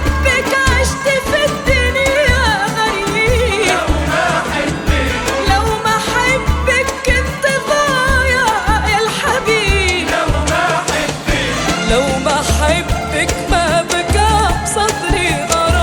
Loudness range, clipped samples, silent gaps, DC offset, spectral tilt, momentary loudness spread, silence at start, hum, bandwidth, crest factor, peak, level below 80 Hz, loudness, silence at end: 1 LU; under 0.1%; none; under 0.1%; -4 dB/octave; 3 LU; 0 s; none; 19.5 kHz; 14 dB; 0 dBFS; -22 dBFS; -14 LUFS; 0 s